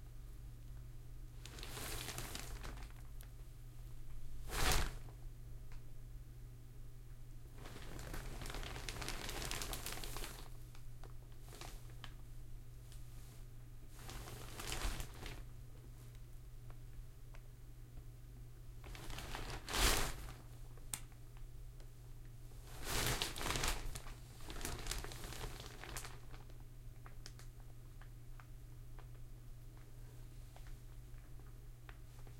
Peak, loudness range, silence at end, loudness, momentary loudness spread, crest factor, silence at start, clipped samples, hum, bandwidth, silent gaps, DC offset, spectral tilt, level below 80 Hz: -18 dBFS; 14 LU; 0 s; -47 LUFS; 18 LU; 28 dB; 0 s; under 0.1%; none; 16.5 kHz; none; under 0.1%; -3 dB/octave; -50 dBFS